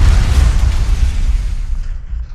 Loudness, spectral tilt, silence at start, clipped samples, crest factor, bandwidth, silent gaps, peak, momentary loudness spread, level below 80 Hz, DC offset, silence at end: -17 LUFS; -5.5 dB/octave; 0 s; under 0.1%; 12 dB; 11.5 kHz; none; 0 dBFS; 13 LU; -12 dBFS; under 0.1%; 0 s